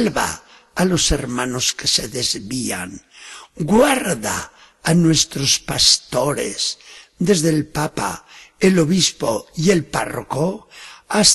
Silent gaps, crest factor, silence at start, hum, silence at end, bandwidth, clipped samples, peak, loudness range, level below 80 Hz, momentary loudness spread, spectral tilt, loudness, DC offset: none; 20 dB; 0 s; none; 0 s; 13 kHz; under 0.1%; 0 dBFS; 3 LU; -40 dBFS; 18 LU; -3.5 dB/octave; -18 LUFS; under 0.1%